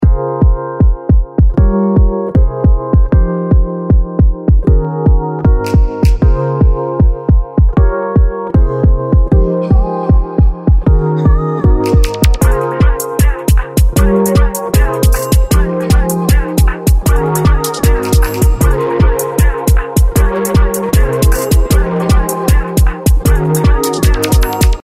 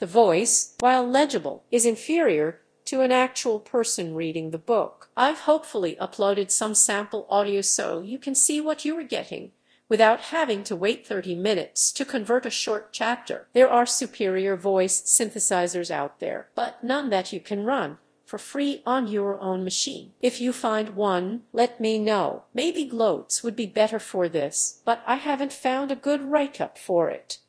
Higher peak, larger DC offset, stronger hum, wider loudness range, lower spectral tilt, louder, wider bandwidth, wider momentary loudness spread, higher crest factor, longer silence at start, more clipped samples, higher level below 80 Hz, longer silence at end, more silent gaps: first, 0 dBFS vs -4 dBFS; neither; neither; second, 0 LU vs 5 LU; first, -6.5 dB/octave vs -2.5 dB/octave; first, -12 LUFS vs -24 LUFS; first, 16 kHz vs 11 kHz; second, 2 LU vs 10 LU; second, 10 dB vs 20 dB; about the same, 0 s vs 0 s; neither; first, -12 dBFS vs -74 dBFS; about the same, 0.05 s vs 0.1 s; neither